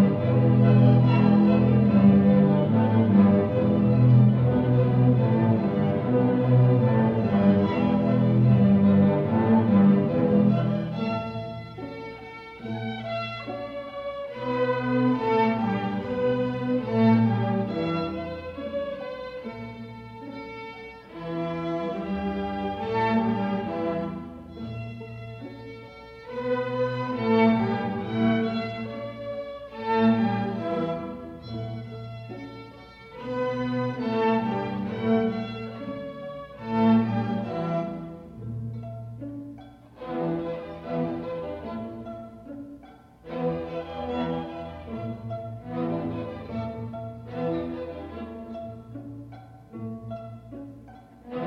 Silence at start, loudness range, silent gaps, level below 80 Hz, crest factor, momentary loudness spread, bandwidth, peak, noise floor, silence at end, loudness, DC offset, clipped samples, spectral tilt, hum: 0 s; 14 LU; none; -52 dBFS; 18 dB; 20 LU; 5.8 kHz; -8 dBFS; -49 dBFS; 0 s; -24 LUFS; under 0.1%; under 0.1%; -10 dB/octave; none